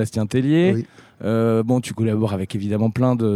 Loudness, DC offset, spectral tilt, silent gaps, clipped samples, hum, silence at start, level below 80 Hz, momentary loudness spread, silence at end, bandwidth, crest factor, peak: -20 LUFS; under 0.1%; -7.5 dB/octave; none; under 0.1%; none; 0 s; -56 dBFS; 8 LU; 0 s; 13.5 kHz; 16 dB; -4 dBFS